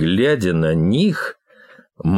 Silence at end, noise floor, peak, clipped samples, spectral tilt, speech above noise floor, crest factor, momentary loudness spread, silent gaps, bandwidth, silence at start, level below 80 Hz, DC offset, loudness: 0 s; -48 dBFS; -6 dBFS; under 0.1%; -7 dB/octave; 32 dB; 12 dB; 9 LU; none; 12.5 kHz; 0 s; -44 dBFS; under 0.1%; -18 LUFS